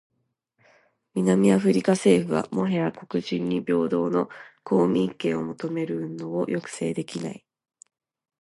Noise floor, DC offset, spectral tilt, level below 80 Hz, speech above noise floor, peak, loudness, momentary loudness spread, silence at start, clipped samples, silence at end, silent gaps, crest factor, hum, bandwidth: -75 dBFS; under 0.1%; -6.5 dB/octave; -64 dBFS; 51 dB; -6 dBFS; -25 LUFS; 12 LU; 1.15 s; under 0.1%; 1.05 s; none; 18 dB; none; 11.5 kHz